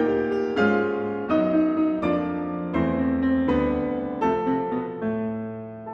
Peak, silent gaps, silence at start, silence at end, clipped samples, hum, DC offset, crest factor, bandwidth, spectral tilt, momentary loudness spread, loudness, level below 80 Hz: -8 dBFS; none; 0 s; 0 s; under 0.1%; none; under 0.1%; 14 dB; 7.2 kHz; -8.5 dB/octave; 7 LU; -24 LUFS; -48 dBFS